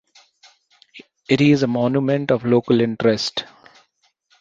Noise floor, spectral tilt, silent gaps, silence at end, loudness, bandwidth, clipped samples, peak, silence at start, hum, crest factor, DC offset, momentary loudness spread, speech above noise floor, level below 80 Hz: -64 dBFS; -6.5 dB/octave; none; 0.95 s; -18 LUFS; 7.8 kHz; under 0.1%; -2 dBFS; 0.95 s; none; 18 dB; under 0.1%; 8 LU; 47 dB; -58 dBFS